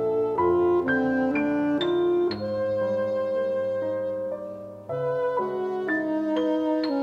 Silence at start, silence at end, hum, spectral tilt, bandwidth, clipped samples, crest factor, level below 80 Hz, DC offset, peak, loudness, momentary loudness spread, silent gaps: 0 s; 0 s; none; -7.5 dB/octave; 6.8 kHz; under 0.1%; 12 dB; -60 dBFS; under 0.1%; -12 dBFS; -25 LUFS; 8 LU; none